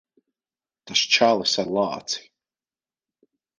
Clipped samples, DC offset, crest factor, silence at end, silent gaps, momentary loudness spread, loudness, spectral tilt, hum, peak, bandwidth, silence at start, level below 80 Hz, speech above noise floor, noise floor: under 0.1%; under 0.1%; 22 dB; 1.4 s; none; 12 LU; -21 LUFS; -2 dB/octave; none; -4 dBFS; 10.5 kHz; 0.85 s; -68 dBFS; over 68 dB; under -90 dBFS